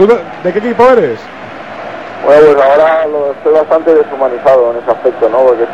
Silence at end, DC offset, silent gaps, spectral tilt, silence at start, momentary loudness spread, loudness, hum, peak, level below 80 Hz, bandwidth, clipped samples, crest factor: 0 s; 0.7%; none; -6.5 dB/octave; 0 s; 18 LU; -9 LUFS; none; 0 dBFS; -48 dBFS; 8 kHz; 1%; 8 dB